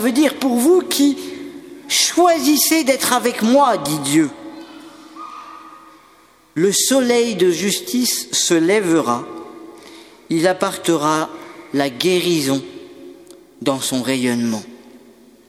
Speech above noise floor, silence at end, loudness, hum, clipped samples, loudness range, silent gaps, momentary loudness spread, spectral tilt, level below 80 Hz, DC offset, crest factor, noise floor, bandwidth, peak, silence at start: 34 dB; 0.5 s; -17 LUFS; none; under 0.1%; 5 LU; none; 21 LU; -3 dB/octave; -64 dBFS; under 0.1%; 18 dB; -50 dBFS; 16.5 kHz; 0 dBFS; 0 s